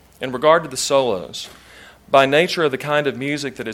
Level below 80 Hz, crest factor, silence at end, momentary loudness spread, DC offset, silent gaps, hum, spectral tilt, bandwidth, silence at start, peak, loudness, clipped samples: -56 dBFS; 18 dB; 0 s; 13 LU; under 0.1%; none; none; -3.5 dB/octave; 16.5 kHz; 0.2 s; 0 dBFS; -18 LUFS; under 0.1%